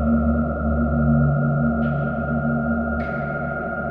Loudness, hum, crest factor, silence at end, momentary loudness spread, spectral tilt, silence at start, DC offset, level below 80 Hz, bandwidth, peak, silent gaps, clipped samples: -22 LUFS; none; 12 dB; 0 s; 7 LU; -12.5 dB/octave; 0 s; under 0.1%; -30 dBFS; 3.5 kHz; -8 dBFS; none; under 0.1%